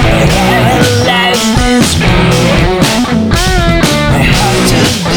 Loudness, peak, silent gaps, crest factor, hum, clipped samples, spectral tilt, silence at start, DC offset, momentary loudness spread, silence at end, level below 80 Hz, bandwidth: -8 LUFS; 0 dBFS; none; 8 dB; none; under 0.1%; -4.5 dB/octave; 0 s; under 0.1%; 1 LU; 0 s; -18 dBFS; over 20 kHz